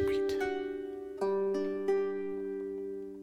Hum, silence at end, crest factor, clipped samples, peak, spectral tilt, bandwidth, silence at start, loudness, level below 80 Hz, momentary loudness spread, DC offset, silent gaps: none; 0 s; 14 dB; under 0.1%; -20 dBFS; -6.5 dB/octave; 11 kHz; 0 s; -34 LUFS; -60 dBFS; 8 LU; under 0.1%; none